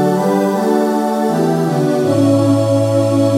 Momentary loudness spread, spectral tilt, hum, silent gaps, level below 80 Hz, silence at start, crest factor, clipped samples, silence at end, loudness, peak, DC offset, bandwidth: 3 LU; -7 dB/octave; none; none; -58 dBFS; 0 s; 12 dB; under 0.1%; 0 s; -14 LUFS; -2 dBFS; under 0.1%; 16.5 kHz